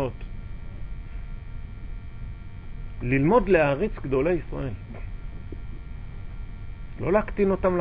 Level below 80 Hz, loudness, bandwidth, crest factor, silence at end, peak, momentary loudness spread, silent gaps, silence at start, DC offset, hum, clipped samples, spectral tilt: -36 dBFS; -24 LUFS; 5 kHz; 20 dB; 0 s; -6 dBFS; 20 LU; none; 0 s; 0.1%; none; under 0.1%; -11.5 dB/octave